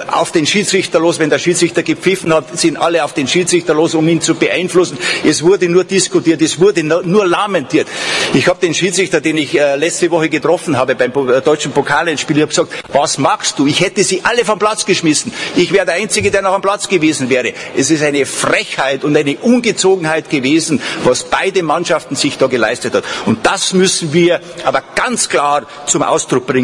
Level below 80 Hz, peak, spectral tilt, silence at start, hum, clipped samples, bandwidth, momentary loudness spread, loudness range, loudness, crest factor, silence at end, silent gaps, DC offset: -50 dBFS; 0 dBFS; -3.5 dB/octave; 0 s; none; under 0.1%; 12 kHz; 4 LU; 1 LU; -13 LUFS; 12 dB; 0 s; none; under 0.1%